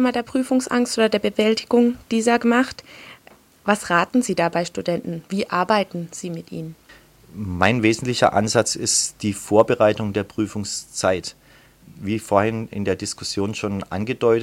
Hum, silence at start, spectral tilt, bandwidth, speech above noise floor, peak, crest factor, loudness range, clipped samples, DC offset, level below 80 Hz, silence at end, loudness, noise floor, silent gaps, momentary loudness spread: none; 0 s; -4 dB/octave; 16 kHz; 30 dB; 0 dBFS; 20 dB; 5 LU; under 0.1%; under 0.1%; -54 dBFS; 0 s; -21 LUFS; -51 dBFS; none; 13 LU